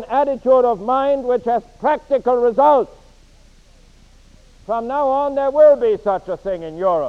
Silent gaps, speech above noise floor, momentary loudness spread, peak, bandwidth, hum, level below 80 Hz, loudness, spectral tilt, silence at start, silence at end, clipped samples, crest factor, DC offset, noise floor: none; 31 dB; 12 LU; -2 dBFS; 7 kHz; none; -48 dBFS; -17 LUFS; -7 dB/octave; 0 s; 0 s; under 0.1%; 16 dB; under 0.1%; -47 dBFS